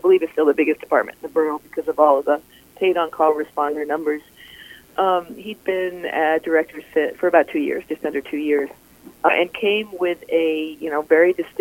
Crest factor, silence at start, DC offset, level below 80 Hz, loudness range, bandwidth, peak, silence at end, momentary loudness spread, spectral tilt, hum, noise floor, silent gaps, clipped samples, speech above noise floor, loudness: 20 dB; 0.05 s; under 0.1%; -62 dBFS; 3 LU; 17 kHz; 0 dBFS; 0 s; 9 LU; -5 dB/octave; none; -43 dBFS; none; under 0.1%; 23 dB; -20 LUFS